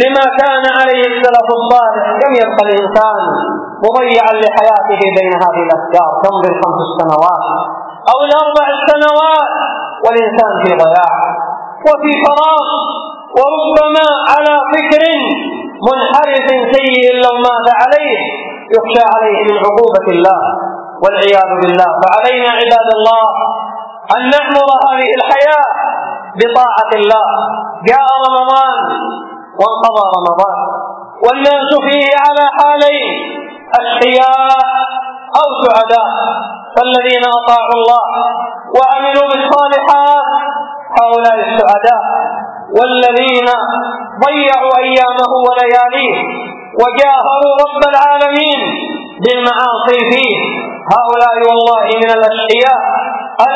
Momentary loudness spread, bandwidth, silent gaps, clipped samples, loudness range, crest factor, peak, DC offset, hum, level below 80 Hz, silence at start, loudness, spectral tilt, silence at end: 8 LU; 8 kHz; none; 1%; 1 LU; 10 dB; 0 dBFS; under 0.1%; none; -54 dBFS; 0 s; -10 LUFS; -5 dB/octave; 0 s